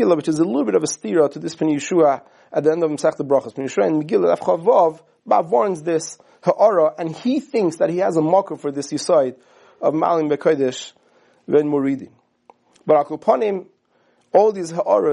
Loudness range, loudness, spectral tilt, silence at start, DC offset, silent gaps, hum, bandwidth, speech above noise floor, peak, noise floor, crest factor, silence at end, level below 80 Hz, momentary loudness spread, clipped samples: 3 LU; -19 LUFS; -5.5 dB/octave; 0 s; under 0.1%; none; none; 11.5 kHz; 43 dB; -2 dBFS; -61 dBFS; 18 dB; 0 s; -72 dBFS; 8 LU; under 0.1%